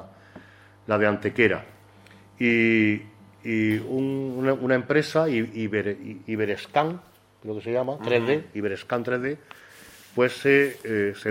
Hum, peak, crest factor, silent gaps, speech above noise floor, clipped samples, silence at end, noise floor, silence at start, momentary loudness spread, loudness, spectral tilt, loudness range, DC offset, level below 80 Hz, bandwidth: none; -4 dBFS; 20 dB; none; 27 dB; under 0.1%; 0 s; -51 dBFS; 0 s; 12 LU; -24 LUFS; -6.5 dB/octave; 4 LU; under 0.1%; -64 dBFS; 16 kHz